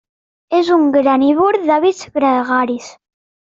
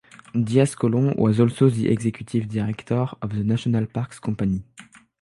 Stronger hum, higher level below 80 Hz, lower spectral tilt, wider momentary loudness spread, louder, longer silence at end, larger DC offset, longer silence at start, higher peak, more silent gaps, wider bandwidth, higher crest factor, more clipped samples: neither; second, -60 dBFS vs -50 dBFS; second, -4.5 dB/octave vs -7.5 dB/octave; second, 6 LU vs 9 LU; first, -14 LUFS vs -23 LUFS; first, 0.55 s vs 0.4 s; neither; first, 0.5 s vs 0.35 s; about the same, -2 dBFS vs -4 dBFS; neither; second, 7.6 kHz vs 11.5 kHz; second, 12 dB vs 18 dB; neither